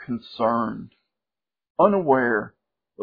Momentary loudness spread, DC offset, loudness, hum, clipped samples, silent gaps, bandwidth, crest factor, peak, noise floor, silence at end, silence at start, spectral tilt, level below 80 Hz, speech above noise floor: 17 LU; under 0.1%; -22 LUFS; none; under 0.1%; 1.70-1.75 s; 5 kHz; 20 dB; -4 dBFS; under -90 dBFS; 0 s; 0 s; -9.5 dB/octave; -62 dBFS; over 68 dB